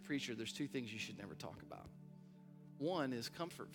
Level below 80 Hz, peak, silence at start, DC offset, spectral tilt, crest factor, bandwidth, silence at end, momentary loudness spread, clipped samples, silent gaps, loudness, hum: -78 dBFS; -26 dBFS; 0 s; under 0.1%; -4.5 dB/octave; 20 dB; 17.5 kHz; 0 s; 19 LU; under 0.1%; none; -45 LUFS; none